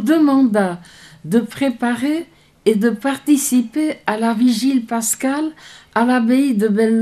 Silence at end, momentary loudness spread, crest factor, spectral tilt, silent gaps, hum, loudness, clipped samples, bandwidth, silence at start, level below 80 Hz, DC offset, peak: 0 s; 8 LU; 16 dB; -4.5 dB/octave; none; none; -17 LUFS; under 0.1%; 15.5 kHz; 0 s; -60 dBFS; under 0.1%; -2 dBFS